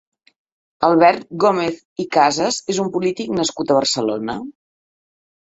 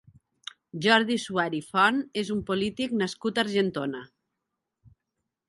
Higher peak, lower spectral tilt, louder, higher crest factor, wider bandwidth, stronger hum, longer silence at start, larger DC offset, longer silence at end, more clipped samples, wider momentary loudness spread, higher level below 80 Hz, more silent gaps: first, 0 dBFS vs -6 dBFS; about the same, -4 dB/octave vs -4.5 dB/octave; first, -18 LUFS vs -26 LUFS; second, 18 dB vs 24 dB; second, 8.2 kHz vs 11.5 kHz; neither; about the same, 0.8 s vs 0.75 s; neither; second, 1.05 s vs 1.45 s; neither; second, 11 LU vs 18 LU; about the same, -60 dBFS vs -64 dBFS; first, 1.85-1.96 s vs none